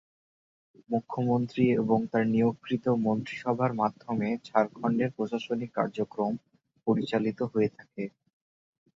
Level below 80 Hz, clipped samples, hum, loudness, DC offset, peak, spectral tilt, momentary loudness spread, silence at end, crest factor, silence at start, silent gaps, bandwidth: -68 dBFS; under 0.1%; none; -29 LUFS; under 0.1%; -8 dBFS; -8.5 dB/octave; 7 LU; 0.9 s; 20 dB; 0.9 s; none; 7.6 kHz